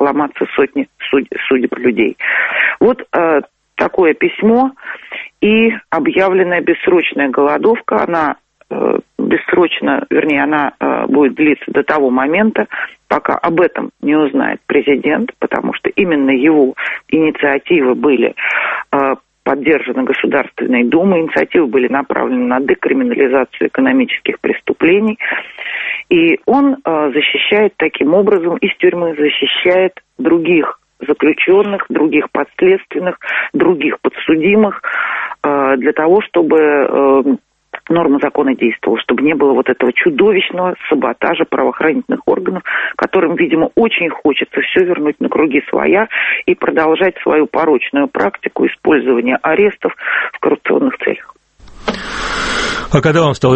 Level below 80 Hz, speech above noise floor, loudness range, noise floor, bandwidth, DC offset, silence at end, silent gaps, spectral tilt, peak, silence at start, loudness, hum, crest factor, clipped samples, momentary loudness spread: -46 dBFS; 25 dB; 2 LU; -38 dBFS; 8.4 kHz; under 0.1%; 0 s; none; -6 dB/octave; 0 dBFS; 0 s; -13 LUFS; none; 12 dB; under 0.1%; 7 LU